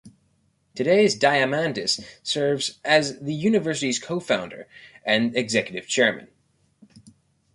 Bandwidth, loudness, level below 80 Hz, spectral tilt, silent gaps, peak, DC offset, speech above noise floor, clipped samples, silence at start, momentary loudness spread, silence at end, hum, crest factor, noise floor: 11.5 kHz; -22 LUFS; -64 dBFS; -3.5 dB/octave; none; -4 dBFS; under 0.1%; 43 dB; under 0.1%; 0.05 s; 9 LU; 1.3 s; none; 20 dB; -66 dBFS